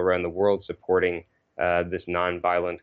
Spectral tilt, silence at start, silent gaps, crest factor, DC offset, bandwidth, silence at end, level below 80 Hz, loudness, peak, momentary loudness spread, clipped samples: -4 dB/octave; 0 s; none; 16 dB; under 0.1%; 5 kHz; 0.05 s; -56 dBFS; -25 LUFS; -10 dBFS; 5 LU; under 0.1%